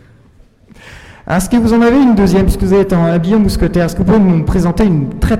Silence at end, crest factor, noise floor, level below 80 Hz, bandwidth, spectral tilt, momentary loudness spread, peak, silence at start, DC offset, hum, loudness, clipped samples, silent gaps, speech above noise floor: 0 s; 8 dB; -44 dBFS; -22 dBFS; 15.5 kHz; -7.5 dB/octave; 5 LU; -2 dBFS; 0.85 s; 1%; none; -11 LUFS; under 0.1%; none; 34 dB